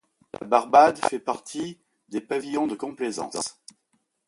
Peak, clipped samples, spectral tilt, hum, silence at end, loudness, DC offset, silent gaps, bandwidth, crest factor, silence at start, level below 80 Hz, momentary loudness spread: -2 dBFS; under 0.1%; -3.5 dB/octave; none; 0.75 s; -24 LUFS; under 0.1%; none; 11.5 kHz; 22 dB; 0.4 s; -68 dBFS; 17 LU